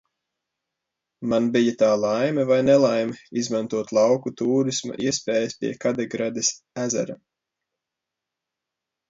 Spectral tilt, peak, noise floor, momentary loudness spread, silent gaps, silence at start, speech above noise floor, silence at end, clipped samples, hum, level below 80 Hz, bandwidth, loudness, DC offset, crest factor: -4.5 dB/octave; -6 dBFS; -85 dBFS; 9 LU; none; 1.2 s; 63 dB; 1.95 s; under 0.1%; none; -64 dBFS; 7.8 kHz; -22 LUFS; under 0.1%; 18 dB